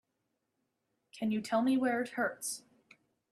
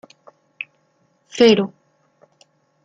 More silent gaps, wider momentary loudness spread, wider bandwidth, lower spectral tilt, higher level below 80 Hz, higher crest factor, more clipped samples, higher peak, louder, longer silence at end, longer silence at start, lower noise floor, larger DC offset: neither; second, 10 LU vs 20 LU; first, 14 kHz vs 7.8 kHz; about the same, -4 dB/octave vs -5 dB/octave; second, -82 dBFS vs -64 dBFS; about the same, 18 dB vs 20 dB; neither; second, -18 dBFS vs -2 dBFS; second, -33 LUFS vs -16 LUFS; second, 0.75 s vs 1.15 s; second, 1.15 s vs 1.35 s; first, -83 dBFS vs -63 dBFS; neither